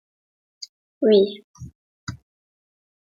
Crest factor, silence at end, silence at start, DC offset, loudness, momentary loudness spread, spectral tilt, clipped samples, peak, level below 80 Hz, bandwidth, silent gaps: 20 dB; 1 s; 0.6 s; under 0.1%; -19 LUFS; 26 LU; -6 dB/octave; under 0.1%; -6 dBFS; -60 dBFS; 7.4 kHz; 0.69-1.01 s, 1.44-1.54 s, 1.75-2.07 s